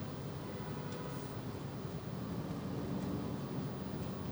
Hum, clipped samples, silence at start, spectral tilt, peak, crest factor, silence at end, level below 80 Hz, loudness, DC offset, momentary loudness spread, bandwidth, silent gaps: none; under 0.1%; 0 s; -7 dB/octave; -28 dBFS; 14 dB; 0 s; -58 dBFS; -42 LUFS; under 0.1%; 4 LU; over 20 kHz; none